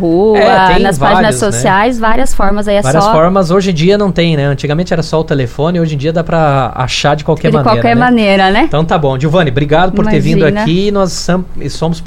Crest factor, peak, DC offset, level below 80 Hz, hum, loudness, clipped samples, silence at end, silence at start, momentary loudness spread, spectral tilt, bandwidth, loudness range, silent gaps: 10 dB; 0 dBFS; under 0.1%; -24 dBFS; none; -10 LUFS; 0.1%; 0 s; 0 s; 6 LU; -6 dB/octave; 14 kHz; 2 LU; none